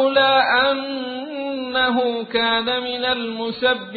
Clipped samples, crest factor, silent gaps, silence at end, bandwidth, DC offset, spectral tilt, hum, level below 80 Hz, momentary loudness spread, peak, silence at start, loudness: under 0.1%; 16 dB; none; 0 s; 4.8 kHz; under 0.1%; -8 dB/octave; none; -56 dBFS; 12 LU; -4 dBFS; 0 s; -20 LUFS